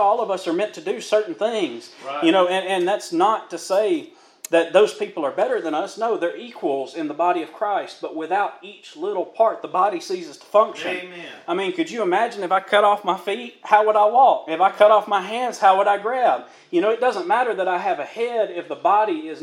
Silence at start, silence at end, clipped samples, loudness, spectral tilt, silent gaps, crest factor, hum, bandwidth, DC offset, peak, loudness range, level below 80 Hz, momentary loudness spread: 0 s; 0 s; under 0.1%; -21 LUFS; -4 dB/octave; none; 20 dB; none; 14 kHz; under 0.1%; 0 dBFS; 6 LU; -88 dBFS; 12 LU